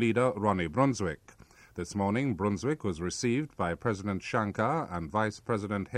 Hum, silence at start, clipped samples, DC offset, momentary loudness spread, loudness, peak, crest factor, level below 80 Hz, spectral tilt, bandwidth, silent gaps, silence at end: none; 0 s; under 0.1%; under 0.1%; 7 LU; -31 LUFS; -12 dBFS; 18 dB; -56 dBFS; -6 dB/octave; 12.5 kHz; none; 0 s